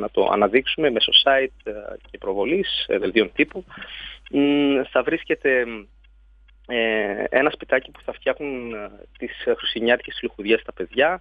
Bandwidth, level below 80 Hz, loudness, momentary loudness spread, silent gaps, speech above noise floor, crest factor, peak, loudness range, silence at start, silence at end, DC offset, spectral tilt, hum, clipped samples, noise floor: 5.2 kHz; -50 dBFS; -21 LUFS; 16 LU; none; 30 dB; 20 dB; -2 dBFS; 5 LU; 0 s; 0 s; under 0.1%; -6.5 dB/octave; none; under 0.1%; -52 dBFS